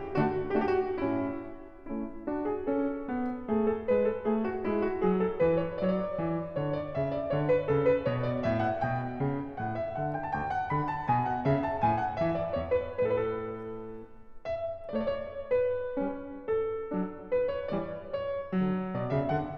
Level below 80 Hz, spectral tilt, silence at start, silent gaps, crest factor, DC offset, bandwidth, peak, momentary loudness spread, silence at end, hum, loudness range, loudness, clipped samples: -54 dBFS; -9.5 dB/octave; 0 s; none; 16 dB; under 0.1%; 6.6 kHz; -16 dBFS; 8 LU; 0 s; none; 4 LU; -31 LUFS; under 0.1%